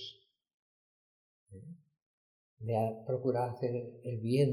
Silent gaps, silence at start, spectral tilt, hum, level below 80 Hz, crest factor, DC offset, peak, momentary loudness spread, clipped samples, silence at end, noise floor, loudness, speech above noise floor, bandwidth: 0.54-1.46 s, 2.02-2.57 s; 0 s; -8 dB/octave; none; -78 dBFS; 18 dB; under 0.1%; -18 dBFS; 19 LU; under 0.1%; 0 s; -54 dBFS; -35 LUFS; 20 dB; 12.5 kHz